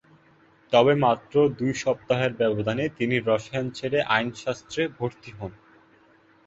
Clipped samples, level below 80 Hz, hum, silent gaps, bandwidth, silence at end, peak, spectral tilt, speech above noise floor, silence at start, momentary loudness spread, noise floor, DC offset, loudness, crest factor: under 0.1%; -58 dBFS; none; none; 8 kHz; 0.95 s; -4 dBFS; -5.5 dB/octave; 34 dB; 0.7 s; 12 LU; -58 dBFS; under 0.1%; -24 LUFS; 20 dB